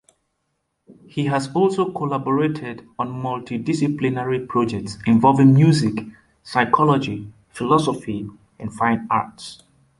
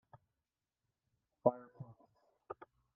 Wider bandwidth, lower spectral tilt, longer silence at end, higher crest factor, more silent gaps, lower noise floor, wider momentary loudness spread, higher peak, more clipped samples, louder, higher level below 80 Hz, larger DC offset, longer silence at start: first, 11.5 kHz vs 3.4 kHz; second, -7 dB/octave vs -10 dB/octave; about the same, 0.45 s vs 0.4 s; second, 18 dB vs 30 dB; neither; second, -73 dBFS vs under -90 dBFS; about the same, 18 LU vs 20 LU; first, -2 dBFS vs -14 dBFS; neither; first, -20 LUFS vs -37 LUFS; first, -54 dBFS vs -84 dBFS; neither; second, 0.9 s vs 1.45 s